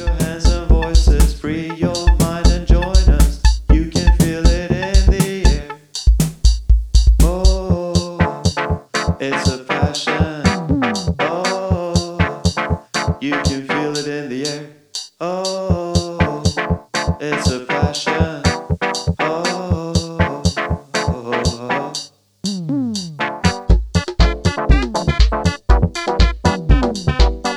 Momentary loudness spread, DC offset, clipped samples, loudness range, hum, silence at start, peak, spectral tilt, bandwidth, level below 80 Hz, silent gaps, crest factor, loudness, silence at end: 7 LU; under 0.1%; under 0.1%; 5 LU; none; 0 s; 0 dBFS; -5 dB/octave; 14 kHz; -18 dBFS; none; 14 dB; -18 LUFS; 0 s